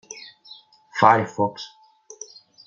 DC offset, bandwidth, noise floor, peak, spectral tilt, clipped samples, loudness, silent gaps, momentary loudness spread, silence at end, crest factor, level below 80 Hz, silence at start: under 0.1%; 7.6 kHz; -49 dBFS; -2 dBFS; -4.5 dB/octave; under 0.1%; -20 LUFS; none; 24 LU; 1 s; 22 dB; -70 dBFS; 0.1 s